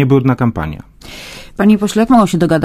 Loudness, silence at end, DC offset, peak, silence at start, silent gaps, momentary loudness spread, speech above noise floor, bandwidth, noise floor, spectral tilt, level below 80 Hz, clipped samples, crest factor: -12 LUFS; 0 s; under 0.1%; 0 dBFS; 0 s; none; 20 LU; 21 dB; 15.5 kHz; -32 dBFS; -7 dB/octave; -36 dBFS; under 0.1%; 12 dB